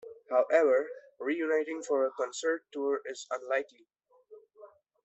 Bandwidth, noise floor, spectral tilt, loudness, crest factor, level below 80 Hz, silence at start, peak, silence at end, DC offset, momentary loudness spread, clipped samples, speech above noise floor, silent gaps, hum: 8.2 kHz; -57 dBFS; -2 dB/octave; -31 LUFS; 20 dB; -84 dBFS; 0.05 s; -12 dBFS; 0.4 s; under 0.1%; 13 LU; under 0.1%; 26 dB; none; none